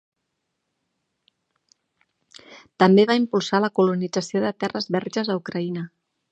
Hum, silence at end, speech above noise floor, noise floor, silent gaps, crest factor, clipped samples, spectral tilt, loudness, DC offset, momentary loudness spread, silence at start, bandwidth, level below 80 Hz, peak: none; 0.45 s; 57 dB; -78 dBFS; none; 22 dB; under 0.1%; -6 dB/octave; -22 LUFS; under 0.1%; 12 LU; 2.5 s; 8.6 kHz; -72 dBFS; -2 dBFS